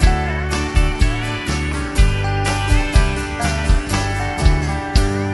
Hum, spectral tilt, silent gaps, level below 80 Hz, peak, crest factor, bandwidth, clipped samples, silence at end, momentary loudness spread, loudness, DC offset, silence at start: none; -5 dB/octave; none; -18 dBFS; 0 dBFS; 16 dB; 12 kHz; under 0.1%; 0 s; 4 LU; -19 LUFS; under 0.1%; 0 s